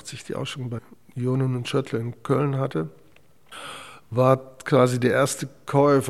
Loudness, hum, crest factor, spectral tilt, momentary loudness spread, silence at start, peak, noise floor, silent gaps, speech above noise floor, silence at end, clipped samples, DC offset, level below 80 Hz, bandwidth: -24 LUFS; none; 22 dB; -6 dB/octave; 17 LU; 0.05 s; -2 dBFS; -58 dBFS; none; 35 dB; 0 s; under 0.1%; 0.2%; -66 dBFS; 14 kHz